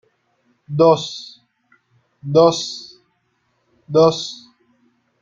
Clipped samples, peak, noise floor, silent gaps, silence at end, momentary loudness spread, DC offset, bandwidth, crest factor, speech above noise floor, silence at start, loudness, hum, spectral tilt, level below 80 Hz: under 0.1%; -2 dBFS; -67 dBFS; none; 0.85 s; 20 LU; under 0.1%; 7.6 kHz; 20 dB; 51 dB; 0.7 s; -17 LUFS; none; -5.5 dB/octave; -62 dBFS